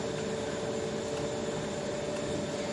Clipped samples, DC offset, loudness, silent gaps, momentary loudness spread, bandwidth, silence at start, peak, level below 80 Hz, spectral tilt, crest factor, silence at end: under 0.1%; under 0.1%; -34 LUFS; none; 1 LU; 11.5 kHz; 0 s; -22 dBFS; -58 dBFS; -4.5 dB/octave; 12 dB; 0 s